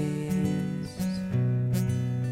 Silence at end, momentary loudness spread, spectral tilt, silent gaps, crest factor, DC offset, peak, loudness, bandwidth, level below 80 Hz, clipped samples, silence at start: 0 s; 5 LU; -7.5 dB/octave; none; 12 dB; under 0.1%; -16 dBFS; -29 LUFS; 16 kHz; -54 dBFS; under 0.1%; 0 s